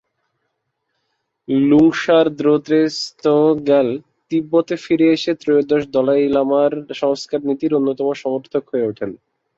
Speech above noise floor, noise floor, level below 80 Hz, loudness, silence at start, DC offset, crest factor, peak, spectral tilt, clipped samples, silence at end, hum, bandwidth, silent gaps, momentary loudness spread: 57 dB; -73 dBFS; -58 dBFS; -17 LUFS; 1.5 s; under 0.1%; 14 dB; -2 dBFS; -6 dB/octave; under 0.1%; 0.4 s; none; 7.8 kHz; none; 8 LU